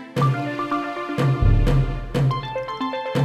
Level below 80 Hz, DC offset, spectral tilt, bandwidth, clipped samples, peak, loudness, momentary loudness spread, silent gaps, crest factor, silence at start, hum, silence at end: -28 dBFS; under 0.1%; -7.5 dB/octave; 12 kHz; under 0.1%; -6 dBFS; -22 LUFS; 8 LU; none; 16 dB; 0 s; none; 0 s